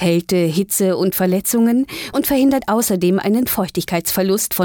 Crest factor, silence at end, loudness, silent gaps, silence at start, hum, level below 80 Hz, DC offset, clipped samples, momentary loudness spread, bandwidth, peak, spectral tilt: 10 dB; 0 s; -17 LUFS; none; 0 s; none; -48 dBFS; under 0.1%; under 0.1%; 4 LU; over 20 kHz; -6 dBFS; -5 dB/octave